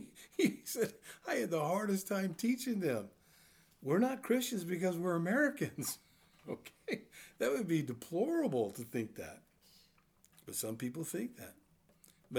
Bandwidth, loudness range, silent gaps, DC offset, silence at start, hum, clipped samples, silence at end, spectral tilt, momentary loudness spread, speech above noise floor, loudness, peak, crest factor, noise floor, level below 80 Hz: over 20 kHz; 5 LU; none; under 0.1%; 0 s; none; under 0.1%; 0 s; -5 dB/octave; 14 LU; 33 dB; -37 LUFS; -18 dBFS; 20 dB; -69 dBFS; -78 dBFS